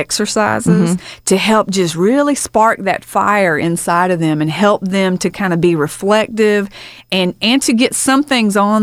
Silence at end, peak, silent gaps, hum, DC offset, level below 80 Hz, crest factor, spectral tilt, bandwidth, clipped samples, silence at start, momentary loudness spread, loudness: 0 s; 0 dBFS; none; none; under 0.1%; -50 dBFS; 14 dB; -4.5 dB/octave; 16 kHz; under 0.1%; 0 s; 4 LU; -14 LUFS